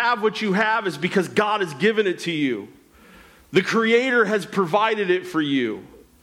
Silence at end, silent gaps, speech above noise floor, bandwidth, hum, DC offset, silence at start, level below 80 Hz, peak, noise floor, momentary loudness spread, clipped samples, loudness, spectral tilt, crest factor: 0.25 s; none; 28 dB; 15.5 kHz; none; under 0.1%; 0 s; -64 dBFS; -6 dBFS; -49 dBFS; 6 LU; under 0.1%; -21 LUFS; -5 dB/octave; 16 dB